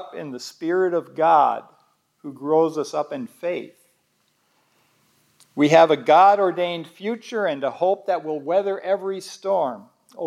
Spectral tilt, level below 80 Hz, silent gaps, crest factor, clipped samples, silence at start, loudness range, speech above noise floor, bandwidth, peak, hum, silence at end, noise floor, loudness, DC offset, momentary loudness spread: -5.5 dB/octave; -86 dBFS; none; 20 dB; under 0.1%; 0 s; 8 LU; 47 dB; 13.5 kHz; -2 dBFS; none; 0 s; -67 dBFS; -21 LUFS; under 0.1%; 17 LU